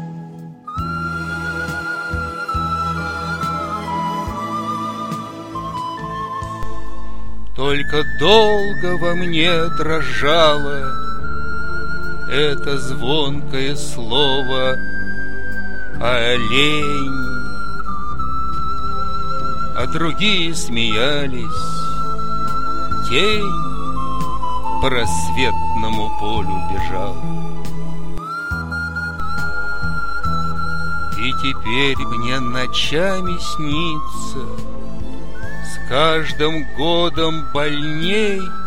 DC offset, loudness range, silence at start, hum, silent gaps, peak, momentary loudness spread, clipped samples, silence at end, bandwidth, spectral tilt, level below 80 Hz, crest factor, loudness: 20%; 6 LU; 0 s; none; none; 0 dBFS; 12 LU; under 0.1%; 0 s; 16.5 kHz; -4.5 dB/octave; -34 dBFS; 20 dB; -20 LUFS